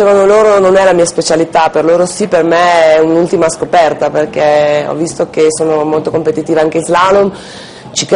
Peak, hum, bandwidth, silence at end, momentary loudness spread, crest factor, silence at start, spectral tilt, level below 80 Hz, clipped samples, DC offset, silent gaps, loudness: 0 dBFS; none; 11 kHz; 0 s; 8 LU; 10 dB; 0 s; -4.5 dB/octave; -46 dBFS; under 0.1%; under 0.1%; none; -9 LUFS